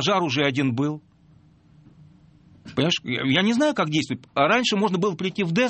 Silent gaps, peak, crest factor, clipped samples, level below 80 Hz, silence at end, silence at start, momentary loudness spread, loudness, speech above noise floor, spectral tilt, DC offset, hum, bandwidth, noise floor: none; -6 dBFS; 18 dB; under 0.1%; -62 dBFS; 0 s; 0 s; 8 LU; -22 LUFS; 32 dB; -5 dB/octave; under 0.1%; none; 8.8 kHz; -55 dBFS